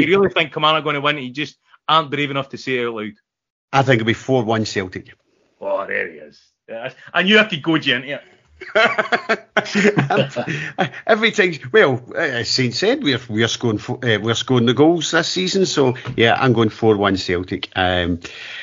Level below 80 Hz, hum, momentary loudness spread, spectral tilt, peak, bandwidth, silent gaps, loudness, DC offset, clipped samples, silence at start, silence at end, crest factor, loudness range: -54 dBFS; none; 12 LU; -3 dB/octave; 0 dBFS; 7.6 kHz; 3.50-3.68 s; -18 LUFS; under 0.1%; under 0.1%; 0 s; 0 s; 18 dB; 4 LU